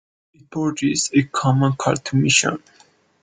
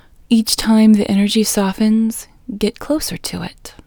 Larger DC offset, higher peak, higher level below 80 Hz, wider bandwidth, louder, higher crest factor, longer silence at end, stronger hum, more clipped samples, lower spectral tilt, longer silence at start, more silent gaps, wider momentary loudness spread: neither; about the same, 0 dBFS vs 0 dBFS; second, -56 dBFS vs -42 dBFS; second, 9.6 kHz vs over 20 kHz; second, -19 LUFS vs -15 LUFS; about the same, 20 dB vs 16 dB; first, 0.65 s vs 0.15 s; neither; neither; about the same, -4 dB/octave vs -4.5 dB/octave; first, 0.5 s vs 0.3 s; neither; second, 9 LU vs 15 LU